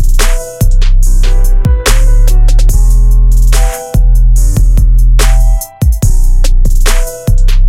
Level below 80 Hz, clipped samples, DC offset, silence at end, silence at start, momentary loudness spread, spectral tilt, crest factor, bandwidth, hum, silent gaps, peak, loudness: -6 dBFS; 0.2%; under 0.1%; 0 s; 0 s; 4 LU; -4.5 dB/octave; 4 dB; 15 kHz; none; none; 0 dBFS; -11 LUFS